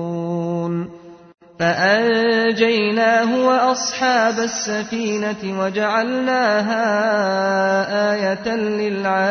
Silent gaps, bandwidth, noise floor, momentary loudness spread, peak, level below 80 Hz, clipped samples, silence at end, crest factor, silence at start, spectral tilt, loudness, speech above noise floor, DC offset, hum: none; 6.6 kHz; -39 dBFS; 7 LU; -4 dBFS; -60 dBFS; under 0.1%; 0 s; 14 dB; 0 s; -4 dB/octave; -18 LUFS; 21 dB; under 0.1%; none